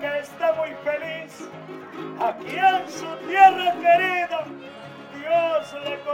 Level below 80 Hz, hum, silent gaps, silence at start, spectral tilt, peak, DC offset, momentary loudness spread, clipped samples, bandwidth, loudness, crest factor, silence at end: -72 dBFS; none; none; 0 s; -4 dB/octave; -2 dBFS; under 0.1%; 22 LU; under 0.1%; 16.5 kHz; -22 LUFS; 22 dB; 0 s